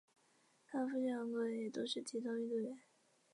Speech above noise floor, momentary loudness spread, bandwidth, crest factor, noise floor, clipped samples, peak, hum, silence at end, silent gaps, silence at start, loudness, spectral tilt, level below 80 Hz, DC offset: 33 dB; 6 LU; 11 kHz; 14 dB; -74 dBFS; under 0.1%; -28 dBFS; none; 0.55 s; none; 0.7 s; -42 LUFS; -4.5 dB/octave; under -90 dBFS; under 0.1%